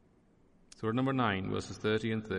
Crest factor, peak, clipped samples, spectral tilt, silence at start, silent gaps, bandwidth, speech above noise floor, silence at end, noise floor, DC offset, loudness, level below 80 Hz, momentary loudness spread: 16 dB; -18 dBFS; under 0.1%; -6.5 dB/octave; 0.8 s; none; 10.5 kHz; 33 dB; 0 s; -65 dBFS; under 0.1%; -33 LUFS; -64 dBFS; 6 LU